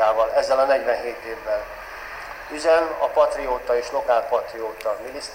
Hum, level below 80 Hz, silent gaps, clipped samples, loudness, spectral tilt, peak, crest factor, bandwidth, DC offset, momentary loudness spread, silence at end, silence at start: none; -50 dBFS; none; under 0.1%; -22 LUFS; -3 dB/octave; -6 dBFS; 16 dB; 16 kHz; under 0.1%; 15 LU; 0 s; 0 s